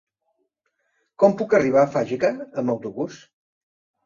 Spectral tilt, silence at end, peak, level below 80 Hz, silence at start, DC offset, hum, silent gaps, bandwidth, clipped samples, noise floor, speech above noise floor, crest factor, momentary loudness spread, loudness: -7 dB/octave; 0.9 s; -4 dBFS; -64 dBFS; 1.2 s; under 0.1%; none; none; 7.4 kHz; under 0.1%; -73 dBFS; 53 dB; 20 dB; 13 LU; -21 LUFS